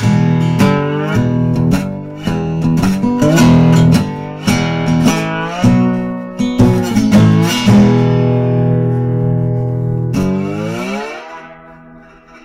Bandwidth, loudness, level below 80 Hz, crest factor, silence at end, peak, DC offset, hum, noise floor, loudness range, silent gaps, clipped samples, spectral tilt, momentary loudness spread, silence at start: 15.5 kHz; -13 LUFS; -34 dBFS; 12 dB; 0.05 s; -2 dBFS; under 0.1%; none; -39 dBFS; 5 LU; none; under 0.1%; -7 dB/octave; 11 LU; 0 s